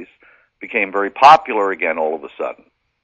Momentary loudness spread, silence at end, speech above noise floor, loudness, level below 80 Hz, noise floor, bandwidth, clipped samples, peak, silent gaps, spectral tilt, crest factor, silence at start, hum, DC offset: 18 LU; 0.5 s; 37 dB; -15 LUFS; -62 dBFS; -53 dBFS; 9.2 kHz; 0.1%; 0 dBFS; none; -4 dB/octave; 18 dB; 0 s; none; under 0.1%